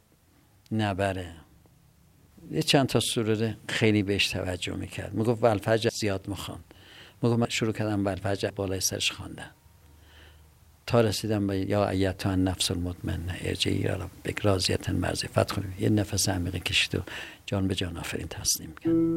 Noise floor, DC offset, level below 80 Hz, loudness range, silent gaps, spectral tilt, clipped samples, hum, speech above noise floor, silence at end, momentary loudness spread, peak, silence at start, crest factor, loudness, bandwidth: -62 dBFS; under 0.1%; -54 dBFS; 3 LU; none; -4.5 dB/octave; under 0.1%; none; 34 dB; 0 s; 10 LU; -6 dBFS; 0.7 s; 22 dB; -27 LUFS; 16 kHz